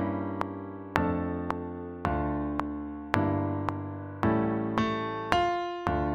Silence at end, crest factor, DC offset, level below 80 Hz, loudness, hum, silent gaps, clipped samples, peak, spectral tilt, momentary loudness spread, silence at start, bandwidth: 0 s; 28 dB; under 0.1%; -46 dBFS; -31 LUFS; none; none; under 0.1%; -2 dBFS; -7.5 dB/octave; 9 LU; 0 s; 12 kHz